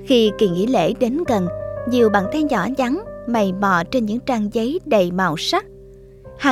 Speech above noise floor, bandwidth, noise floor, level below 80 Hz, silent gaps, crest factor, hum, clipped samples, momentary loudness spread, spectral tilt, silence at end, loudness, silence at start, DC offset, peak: 24 dB; 15.5 kHz; -42 dBFS; -46 dBFS; none; 16 dB; none; under 0.1%; 6 LU; -5.5 dB/octave; 0 s; -19 LUFS; 0 s; under 0.1%; -2 dBFS